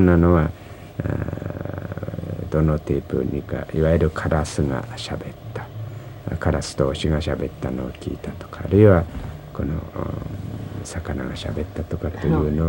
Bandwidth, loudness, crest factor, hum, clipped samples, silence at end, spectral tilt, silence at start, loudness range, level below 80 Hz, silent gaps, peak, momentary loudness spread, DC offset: 16 kHz; -23 LUFS; 20 dB; none; under 0.1%; 0 s; -7.5 dB/octave; 0 s; 5 LU; -34 dBFS; none; -2 dBFS; 15 LU; under 0.1%